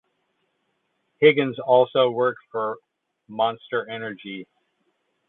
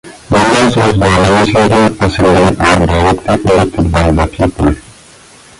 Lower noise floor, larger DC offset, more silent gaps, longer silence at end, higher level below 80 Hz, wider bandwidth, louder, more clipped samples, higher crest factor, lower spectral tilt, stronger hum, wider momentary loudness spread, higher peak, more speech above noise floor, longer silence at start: first, -73 dBFS vs -38 dBFS; neither; neither; about the same, 0.85 s vs 0.8 s; second, -74 dBFS vs -24 dBFS; second, 4.1 kHz vs 11.5 kHz; second, -22 LUFS vs -10 LUFS; neither; first, 22 dB vs 10 dB; first, -9.5 dB/octave vs -6 dB/octave; neither; first, 19 LU vs 4 LU; about the same, -2 dBFS vs 0 dBFS; first, 51 dB vs 29 dB; first, 1.2 s vs 0.05 s